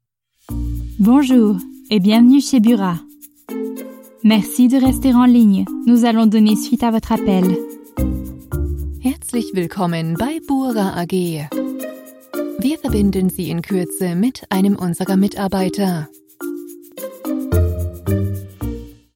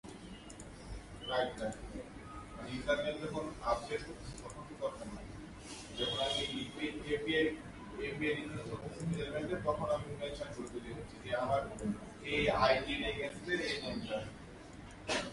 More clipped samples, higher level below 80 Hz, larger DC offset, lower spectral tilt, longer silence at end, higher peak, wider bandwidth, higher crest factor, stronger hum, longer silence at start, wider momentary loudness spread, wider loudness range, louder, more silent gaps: neither; first, -34 dBFS vs -54 dBFS; neither; first, -6.5 dB/octave vs -4.5 dB/octave; first, 0.25 s vs 0 s; first, -2 dBFS vs -16 dBFS; first, 17 kHz vs 11.5 kHz; second, 14 dB vs 22 dB; neither; first, 0.5 s vs 0.05 s; about the same, 16 LU vs 16 LU; about the same, 7 LU vs 5 LU; first, -17 LUFS vs -38 LUFS; neither